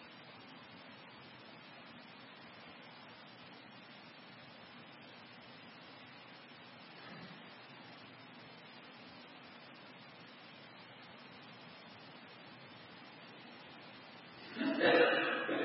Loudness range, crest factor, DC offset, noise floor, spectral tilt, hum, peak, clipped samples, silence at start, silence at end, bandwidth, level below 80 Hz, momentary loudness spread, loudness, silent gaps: 15 LU; 26 dB; under 0.1%; -56 dBFS; -1.5 dB/octave; none; -18 dBFS; under 0.1%; 0 s; 0 s; 5.6 kHz; under -90 dBFS; 17 LU; -34 LUFS; none